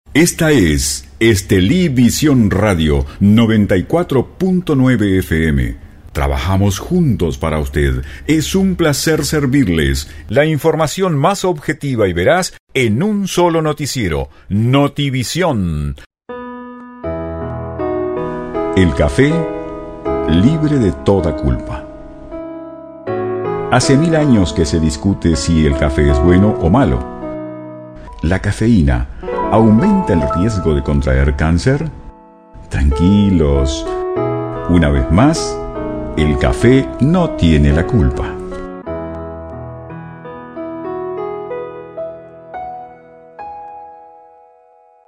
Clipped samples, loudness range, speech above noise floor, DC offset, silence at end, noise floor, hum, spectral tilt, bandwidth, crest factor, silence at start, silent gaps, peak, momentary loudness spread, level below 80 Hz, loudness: under 0.1%; 10 LU; 36 dB; under 0.1%; 1 s; -48 dBFS; none; -6 dB/octave; 16 kHz; 14 dB; 0.1 s; 12.60-12.67 s, 16.06-16.10 s; 0 dBFS; 17 LU; -24 dBFS; -14 LUFS